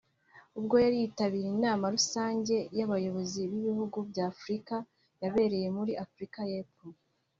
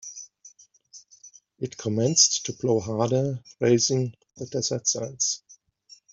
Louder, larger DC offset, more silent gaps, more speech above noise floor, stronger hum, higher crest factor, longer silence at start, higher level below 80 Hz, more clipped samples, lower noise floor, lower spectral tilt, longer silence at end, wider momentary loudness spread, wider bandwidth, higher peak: second, -32 LUFS vs -24 LUFS; neither; neither; about the same, 29 dB vs 31 dB; neither; about the same, 20 dB vs 22 dB; first, 0.35 s vs 0.05 s; about the same, -68 dBFS vs -66 dBFS; neither; first, -61 dBFS vs -55 dBFS; first, -5 dB/octave vs -3.5 dB/octave; second, 0.45 s vs 0.6 s; second, 11 LU vs 17 LU; about the same, 7.6 kHz vs 8 kHz; second, -12 dBFS vs -4 dBFS